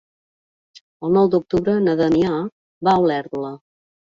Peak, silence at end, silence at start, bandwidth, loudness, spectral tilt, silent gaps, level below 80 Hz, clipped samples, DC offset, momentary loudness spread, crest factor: -4 dBFS; 0.5 s; 1 s; 7.4 kHz; -19 LUFS; -8 dB/octave; 2.52-2.81 s; -52 dBFS; under 0.1%; under 0.1%; 12 LU; 16 dB